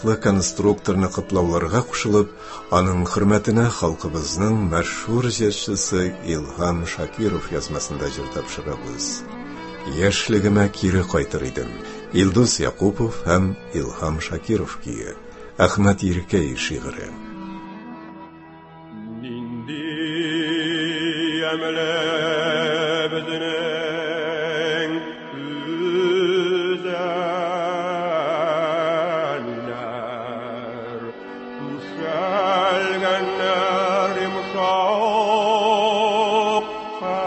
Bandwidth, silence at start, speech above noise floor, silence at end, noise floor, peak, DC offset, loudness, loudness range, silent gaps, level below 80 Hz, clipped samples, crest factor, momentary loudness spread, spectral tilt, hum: 8.6 kHz; 0 s; 22 dB; 0 s; -42 dBFS; 0 dBFS; under 0.1%; -21 LUFS; 7 LU; none; -40 dBFS; under 0.1%; 22 dB; 13 LU; -5 dB/octave; none